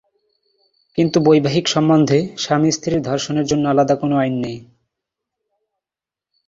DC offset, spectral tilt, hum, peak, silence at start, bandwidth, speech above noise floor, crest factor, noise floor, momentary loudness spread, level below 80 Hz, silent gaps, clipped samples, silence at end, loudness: under 0.1%; -5.5 dB/octave; none; -2 dBFS; 0.95 s; 7.8 kHz; 73 dB; 18 dB; -89 dBFS; 8 LU; -52 dBFS; none; under 0.1%; 1.85 s; -17 LUFS